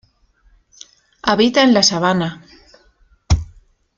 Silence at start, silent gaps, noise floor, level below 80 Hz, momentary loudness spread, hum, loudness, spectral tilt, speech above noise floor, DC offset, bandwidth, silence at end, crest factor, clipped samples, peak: 1.25 s; none; -56 dBFS; -32 dBFS; 12 LU; none; -15 LUFS; -4 dB/octave; 42 dB; under 0.1%; 7.8 kHz; 0.5 s; 18 dB; under 0.1%; 0 dBFS